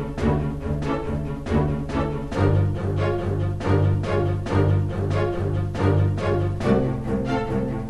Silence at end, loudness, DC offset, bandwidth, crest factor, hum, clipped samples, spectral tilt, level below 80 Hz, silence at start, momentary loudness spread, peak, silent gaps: 0 s; -23 LUFS; under 0.1%; 8.8 kHz; 14 dB; none; under 0.1%; -8.5 dB/octave; -34 dBFS; 0 s; 5 LU; -8 dBFS; none